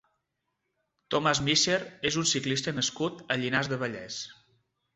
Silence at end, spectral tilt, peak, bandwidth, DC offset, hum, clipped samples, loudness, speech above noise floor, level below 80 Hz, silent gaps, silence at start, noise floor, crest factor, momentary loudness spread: 0.6 s; -3 dB/octave; -10 dBFS; 8.4 kHz; under 0.1%; none; under 0.1%; -28 LUFS; 52 dB; -62 dBFS; none; 1.1 s; -81 dBFS; 22 dB; 12 LU